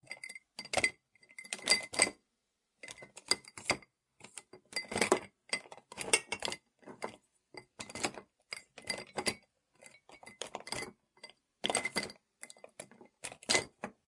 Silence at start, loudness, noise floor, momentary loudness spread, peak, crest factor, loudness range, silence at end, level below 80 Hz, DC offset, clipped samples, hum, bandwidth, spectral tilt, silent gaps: 0.1 s; -35 LUFS; -83 dBFS; 23 LU; -10 dBFS; 30 dB; 7 LU; 0.15 s; -72 dBFS; under 0.1%; under 0.1%; none; 11.5 kHz; -1 dB/octave; none